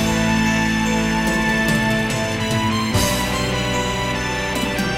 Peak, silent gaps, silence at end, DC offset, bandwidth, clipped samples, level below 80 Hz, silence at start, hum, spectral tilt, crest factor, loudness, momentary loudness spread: -4 dBFS; none; 0 s; under 0.1%; 16 kHz; under 0.1%; -34 dBFS; 0 s; none; -4 dB/octave; 16 dB; -19 LUFS; 4 LU